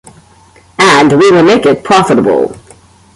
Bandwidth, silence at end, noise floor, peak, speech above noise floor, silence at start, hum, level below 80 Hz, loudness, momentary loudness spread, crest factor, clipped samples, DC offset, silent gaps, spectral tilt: 11.5 kHz; 0.55 s; -42 dBFS; 0 dBFS; 35 dB; 0.8 s; none; -46 dBFS; -7 LUFS; 8 LU; 10 dB; under 0.1%; under 0.1%; none; -5 dB/octave